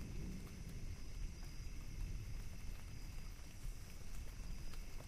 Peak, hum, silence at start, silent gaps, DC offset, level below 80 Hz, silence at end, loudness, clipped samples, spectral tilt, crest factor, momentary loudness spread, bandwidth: -34 dBFS; none; 0 s; none; under 0.1%; -48 dBFS; 0 s; -53 LUFS; under 0.1%; -5 dB/octave; 12 dB; 4 LU; 15.5 kHz